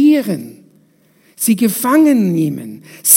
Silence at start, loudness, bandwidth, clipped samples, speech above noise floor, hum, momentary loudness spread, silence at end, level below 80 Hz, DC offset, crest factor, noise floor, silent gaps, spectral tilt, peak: 0 s; -14 LUFS; 16.5 kHz; 0.1%; 39 dB; none; 16 LU; 0 s; -66 dBFS; under 0.1%; 14 dB; -53 dBFS; none; -4.5 dB/octave; 0 dBFS